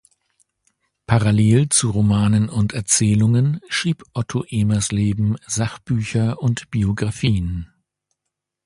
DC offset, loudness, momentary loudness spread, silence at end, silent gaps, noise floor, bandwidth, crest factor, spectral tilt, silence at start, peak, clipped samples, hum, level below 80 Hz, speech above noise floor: under 0.1%; -19 LUFS; 8 LU; 1 s; none; -81 dBFS; 11.5 kHz; 18 dB; -5 dB/octave; 1.1 s; 0 dBFS; under 0.1%; none; -40 dBFS; 63 dB